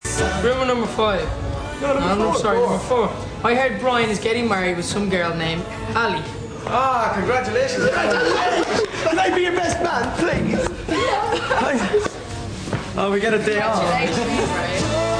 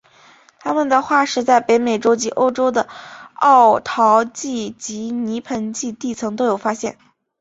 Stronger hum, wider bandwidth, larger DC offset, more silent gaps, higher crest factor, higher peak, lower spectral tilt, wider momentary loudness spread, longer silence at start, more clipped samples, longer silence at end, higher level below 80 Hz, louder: neither; first, 10.5 kHz vs 8 kHz; neither; neither; about the same, 16 dB vs 16 dB; about the same, -4 dBFS vs -2 dBFS; about the same, -4.5 dB/octave vs -3.5 dB/octave; second, 6 LU vs 13 LU; second, 0.05 s vs 0.65 s; neither; second, 0 s vs 0.5 s; first, -38 dBFS vs -62 dBFS; second, -20 LUFS vs -17 LUFS